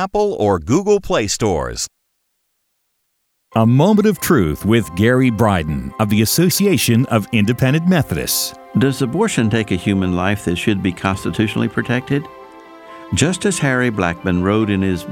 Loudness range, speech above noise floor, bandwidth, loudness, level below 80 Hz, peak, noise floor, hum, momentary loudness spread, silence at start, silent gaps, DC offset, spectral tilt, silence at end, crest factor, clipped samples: 4 LU; 53 dB; 18.5 kHz; -16 LUFS; -40 dBFS; -2 dBFS; -69 dBFS; none; 7 LU; 0 s; none; under 0.1%; -5.5 dB/octave; 0 s; 16 dB; under 0.1%